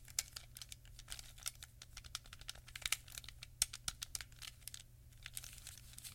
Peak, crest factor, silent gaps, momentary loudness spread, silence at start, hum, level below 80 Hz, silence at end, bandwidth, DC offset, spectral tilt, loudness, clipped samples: -14 dBFS; 36 dB; none; 15 LU; 0 s; none; -62 dBFS; 0 s; 17 kHz; under 0.1%; 0.5 dB/octave; -46 LUFS; under 0.1%